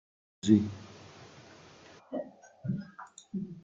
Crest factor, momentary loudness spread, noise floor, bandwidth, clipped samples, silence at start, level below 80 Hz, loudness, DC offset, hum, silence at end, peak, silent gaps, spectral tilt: 24 dB; 27 LU; -55 dBFS; 7.8 kHz; under 0.1%; 0.45 s; -70 dBFS; -32 LUFS; under 0.1%; none; 0.05 s; -10 dBFS; none; -7 dB/octave